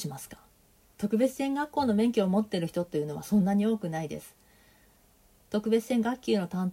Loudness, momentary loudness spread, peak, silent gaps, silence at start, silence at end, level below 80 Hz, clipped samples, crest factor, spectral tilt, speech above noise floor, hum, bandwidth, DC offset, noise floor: -29 LUFS; 11 LU; -14 dBFS; none; 0 s; 0 s; -64 dBFS; under 0.1%; 16 dB; -6.5 dB/octave; 34 dB; none; 16 kHz; under 0.1%; -62 dBFS